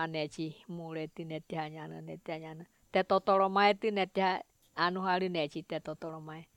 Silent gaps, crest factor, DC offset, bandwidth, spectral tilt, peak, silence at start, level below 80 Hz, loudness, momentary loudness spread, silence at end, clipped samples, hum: none; 22 dB; under 0.1%; 13 kHz; -6 dB/octave; -12 dBFS; 0 s; -74 dBFS; -33 LUFS; 17 LU; 0.1 s; under 0.1%; none